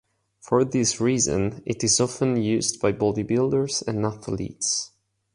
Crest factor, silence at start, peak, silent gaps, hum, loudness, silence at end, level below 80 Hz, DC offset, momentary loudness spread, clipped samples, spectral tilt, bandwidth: 18 dB; 0.45 s; -6 dBFS; none; none; -23 LUFS; 0.45 s; -52 dBFS; under 0.1%; 7 LU; under 0.1%; -4 dB/octave; 11.5 kHz